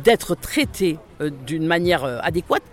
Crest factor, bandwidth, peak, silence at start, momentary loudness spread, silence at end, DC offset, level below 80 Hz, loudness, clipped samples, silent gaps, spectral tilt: 18 dB; 17 kHz; -4 dBFS; 0 s; 9 LU; 0.1 s; under 0.1%; -44 dBFS; -22 LUFS; under 0.1%; none; -5 dB/octave